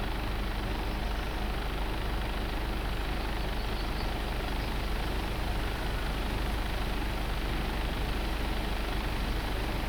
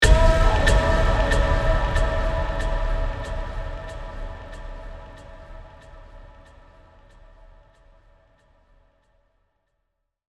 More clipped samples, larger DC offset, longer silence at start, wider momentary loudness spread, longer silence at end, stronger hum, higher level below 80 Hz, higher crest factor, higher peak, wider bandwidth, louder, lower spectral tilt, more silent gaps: neither; neither; about the same, 0 s vs 0 s; second, 1 LU vs 24 LU; second, 0 s vs 4.05 s; neither; second, -34 dBFS vs -26 dBFS; second, 12 dB vs 20 dB; second, -18 dBFS vs -4 dBFS; first, over 20 kHz vs 12 kHz; second, -34 LUFS vs -23 LUFS; about the same, -5 dB/octave vs -5 dB/octave; neither